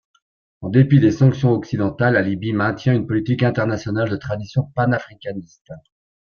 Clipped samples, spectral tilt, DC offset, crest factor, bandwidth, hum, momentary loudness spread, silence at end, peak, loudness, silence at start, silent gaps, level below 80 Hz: under 0.1%; -8.5 dB/octave; under 0.1%; 16 dB; 6.8 kHz; none; 11 LU; 0.45 s; -2 dBFS; -19 LUFS; 0.6 s; 5.61-5.65 s; -50 dBFS